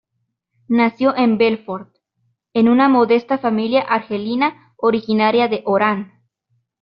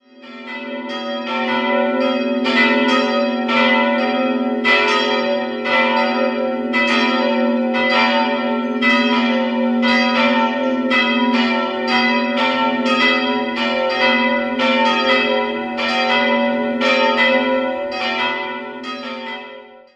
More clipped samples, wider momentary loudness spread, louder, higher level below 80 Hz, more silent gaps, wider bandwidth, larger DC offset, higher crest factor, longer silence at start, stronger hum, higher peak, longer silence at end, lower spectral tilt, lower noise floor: neither; about the same, 11 LU vs 10 LU; about the same, -17 LUFS vs -16 LUFS; about the same, -62 dBFS vs -60 dBFS; neither; second, 5.6 kHz vs 8.4 kHz; neither; about the same, 16 dB vs 16 dB; first, 0.7 s vs 0.15 s; neither; about the same, -2 dBFS vs -2 dBFS; first, 0.75 s vs 0.2 s; about the same, -4 dB/octave vs -4 dB/octave; first, -73 dBFS vs -38 dBFS